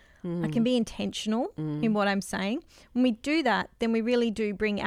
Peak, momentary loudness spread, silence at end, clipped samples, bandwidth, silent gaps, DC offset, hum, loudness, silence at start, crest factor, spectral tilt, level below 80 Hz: -12 dBFS; 7 LU; 0 s; under 0.1%; 14 kHz; none; under 0.1%; none; -28 LUFS; 0.25 s; 16 dB; -5.5 dB/octave; -56 dBFS